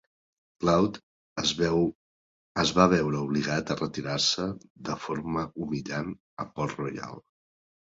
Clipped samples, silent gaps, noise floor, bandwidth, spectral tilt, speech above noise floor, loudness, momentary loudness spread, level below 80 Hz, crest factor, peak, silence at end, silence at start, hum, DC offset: under 0.1%; 1.03-1.36 s, 1.95-2.55 s, 4.70-4.75 s, 6.20-6.37 s; under -90 dBFS; 7.8 kHz; -4.5 dB/octave; over 62 dB; -28 LUFS; 16 LU; -54 dBFS; 24 dB; -4 dBFS; 0.65 s; 0.6 s; none; under 0.1%